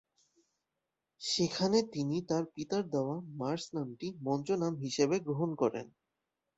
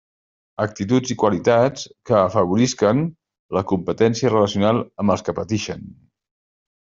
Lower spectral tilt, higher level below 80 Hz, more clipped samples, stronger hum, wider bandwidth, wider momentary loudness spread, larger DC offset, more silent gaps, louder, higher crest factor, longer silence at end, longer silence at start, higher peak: about the same, -5.5 dB/octave vs -6 dB/octave; second, -72 dBFS vs -56 dBFS; neither; neither; about the same, 8.2 kHz vs 7.8 kHz; about the same, 9 LU vs 9 LU; neither; second, none vs 3.39-3.49 s; second, -34 LUFS vs -20 LUFS; about the same, 20 dB vs 18 dB; second, 0.7 s vs 0.95 s; first, 1.2 s vs 0.6 s; second, -16 dBFS vs -2 dBFS